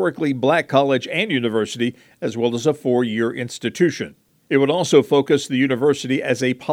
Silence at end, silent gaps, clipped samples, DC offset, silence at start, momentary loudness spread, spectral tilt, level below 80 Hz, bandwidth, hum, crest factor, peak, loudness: 0 s; none; under 0.1%; under 0.1%; 0 s; 9 LU; -5.5 dB/octave; -68 dBFS; 15.5 kHz; none; 18 dB; 0 dBFS; -19 LUFS